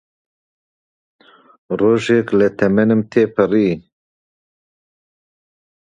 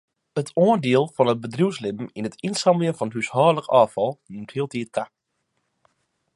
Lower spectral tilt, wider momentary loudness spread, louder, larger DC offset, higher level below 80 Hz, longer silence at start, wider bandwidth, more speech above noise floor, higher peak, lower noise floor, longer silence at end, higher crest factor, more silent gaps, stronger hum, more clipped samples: first, -7.5 dB/octave vs -6 dB/octave; second, 5 LU vs 12 LU; first, -16 LUFS vs -22 LUFS; neither; first, -54 dBFS vs -68 dBFS; first, 1.7 s vs 0.35 s; second, 9.6 kHz vs 11.5 kHz; first, over 75 dB vs 53 dB; first, 0 dBFS vs -4 dBFS; first, under -90 dBFS vs -75 dBFS; first, 2.15 s vs 1.3 s; about the same, 18 dB vs 20 dB; neither; neither; neither